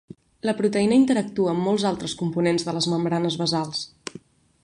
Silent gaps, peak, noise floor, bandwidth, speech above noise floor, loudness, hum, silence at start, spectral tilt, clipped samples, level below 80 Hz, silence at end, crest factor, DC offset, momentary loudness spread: none; -8 dBFS; -47 dBFS; 11.5 kHz; 25 dB; -23 LUFS; none; 0.45 s; -5.5 dB/octave; under 0.1%; -60 dBFS; 0.45 s; 16 dB; under 0.1%; 11 LU